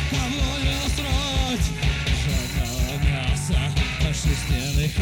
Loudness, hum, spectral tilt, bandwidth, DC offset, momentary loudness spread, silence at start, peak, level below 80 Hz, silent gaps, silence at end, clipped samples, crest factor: -24 LUFS; none; -4.5 dB/octave; 18 kHz; under 0.1%; 2 LU; 0 s; -8 dBFS; -26 dBFS; none; 0 s; under 0.1%; 14 dB